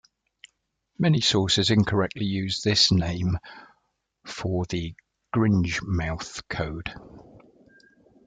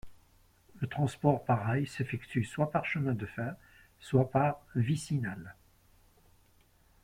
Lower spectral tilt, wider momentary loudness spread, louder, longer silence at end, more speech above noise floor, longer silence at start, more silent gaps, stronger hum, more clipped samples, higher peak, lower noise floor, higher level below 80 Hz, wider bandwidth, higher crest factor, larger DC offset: second, -5 dB/octave vs -7.5 dB/octave; first, 15 LU vs 12 LU; first, -24 LUFS vs -32 LUFS; second, 0.9 s vs 1.5 s; first, 50 dB vs 34 dB; first, 1 s vs 0.05 s; neither; neither; neither; first, -6 dBFS vs -14 dBFS; first, -75 dBFS vs -66 dBFS; first, -48 dBFS vs -62 dBFS; second, 9.4 kHz vs 15.5 kHz; about the same, 20 dB vs 20 dB; neither